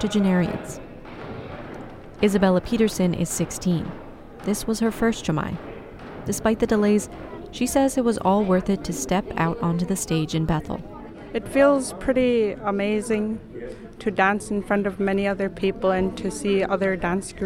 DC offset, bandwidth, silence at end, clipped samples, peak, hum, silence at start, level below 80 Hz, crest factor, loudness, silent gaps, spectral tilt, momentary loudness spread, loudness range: under 0.1%; 16.5 kHz; 0 s; under 0.1%; -4 dBFS; none; 0 s; -44 dBFS; 20 dB; -23 LUFS; none; -5.5 dB/octave; 17 LU; 2 LU